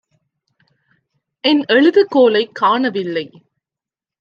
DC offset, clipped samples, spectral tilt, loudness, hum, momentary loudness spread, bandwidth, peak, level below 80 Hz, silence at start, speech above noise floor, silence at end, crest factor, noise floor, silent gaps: under 0.1%; under 0.1%; -6 dB/octave; -14 LUFS; none; 11 LU; 6.8 kHz; -2 dBFS; -72 dBFS; 1.45 s; 74 dB; 0.95 s; 16 dB; -88 dBFS; none